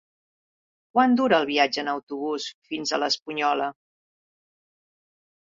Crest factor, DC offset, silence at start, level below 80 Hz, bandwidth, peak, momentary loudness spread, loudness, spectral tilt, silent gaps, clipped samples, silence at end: 22 dB; under 0.1%; 0.95 s; -72 dBFS; 7.6 kHz; -6 dBFS; 10 LU; -24 LUFS; -3 dB/octave; 2.03-2.07 s, 2.54-2.62 s; under 0.1%; 1.85 s